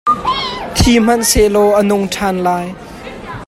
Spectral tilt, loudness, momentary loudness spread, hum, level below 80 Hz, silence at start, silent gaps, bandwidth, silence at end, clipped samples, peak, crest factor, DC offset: -4 dB/octave; -13 LUFS; 17 LU; none; -28 dBFS; 0.05 s; none; 15.5 kHz; 0.05 s; under 0.1%; 0 dBFS; 14 dB; under 0.1%